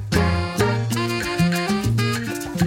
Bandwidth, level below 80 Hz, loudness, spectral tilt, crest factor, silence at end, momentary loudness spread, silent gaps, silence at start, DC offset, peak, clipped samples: 17 kHz; -38 dBFS; -21 LUFS; -5.5 dB/octave; 14 dB; 0 s; 3 LU; none; 0 s; under 0.1%; -6 dBFS; under 0.1%